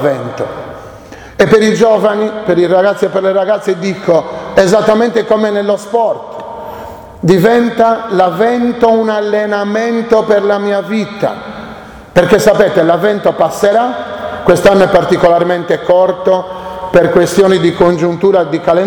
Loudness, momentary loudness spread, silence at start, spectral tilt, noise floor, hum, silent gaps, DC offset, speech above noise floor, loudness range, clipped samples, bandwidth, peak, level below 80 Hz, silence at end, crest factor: -11 LUFS; 14 LU; 0 s; -6 dB/octave; -32 dBFS; none; none; under 0.1%; 22 dB; 3 LU; 0.5%; 19.5 kHz; 0 dBFS; -42 dBFS; 0 s; 10 dB